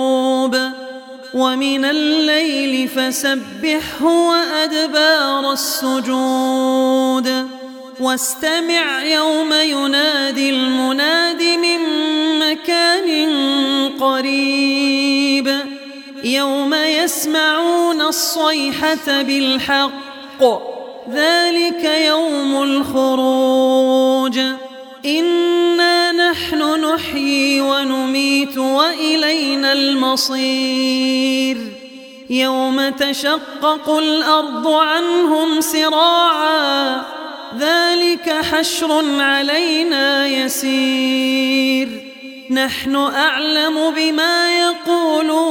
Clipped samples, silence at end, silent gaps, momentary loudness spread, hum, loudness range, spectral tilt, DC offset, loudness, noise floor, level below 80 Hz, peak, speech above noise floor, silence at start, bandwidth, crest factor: under 0.1%; 0 s; none; 6 LU; none; 2 LU; -1.5 dB/octave; under 0.1%; -15 LUFS; -36 dBFS; -58 dBFS; 0 dBFS; 20 dB; 0 s; 18 kHz; 16 dB